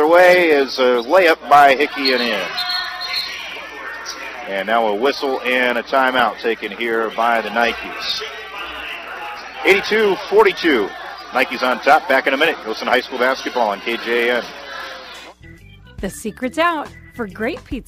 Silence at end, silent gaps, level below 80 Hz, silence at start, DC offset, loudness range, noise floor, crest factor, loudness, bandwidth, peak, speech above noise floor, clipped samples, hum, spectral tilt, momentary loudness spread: 0.05 s; none; -48 dBFS; 0 s; under 0.1%; 7 LU; -41 dBFS; 18 dB; -17 LUFS; 15.5 kHz; 0 dBFS; 25 dB; under 0.1%; none; -3.5 dB/octave; 16 LU